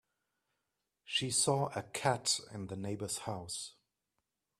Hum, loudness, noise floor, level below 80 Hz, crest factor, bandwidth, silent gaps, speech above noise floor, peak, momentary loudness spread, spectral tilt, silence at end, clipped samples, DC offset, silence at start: none; -35 LUFS; -87 dBFS; -72 dBFS; 24 dB; 15.5 kHz; none; 50 dB; -16 dBFS; 12 LU; -3 dB/octave; 0.9 s; under 0.1%; under 0.1%; 1.05 s